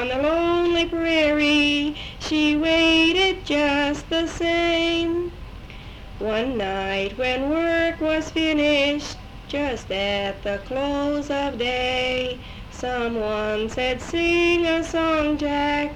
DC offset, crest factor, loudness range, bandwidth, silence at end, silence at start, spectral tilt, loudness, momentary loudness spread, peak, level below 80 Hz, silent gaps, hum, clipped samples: under 0.1%; 14 dB; 6 LU; 10.5 kHz; 0 s; 0 s; -4.5 dB/octave; -22 LUFS; 11 LU; -8 dBFS; -40 dBFS; none; none; under 0.1%